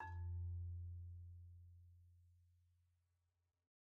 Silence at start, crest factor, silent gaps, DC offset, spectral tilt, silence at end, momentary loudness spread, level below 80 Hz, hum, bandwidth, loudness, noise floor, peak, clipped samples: 0 s; 14 dB; none; under 0.1%; -5 dB/octave; 1.3 s; 17 LU; -62 dBFS; none; 2.7 kHz; -52 LUFS; -88 dBFS; -40 dBFS; under 0.1%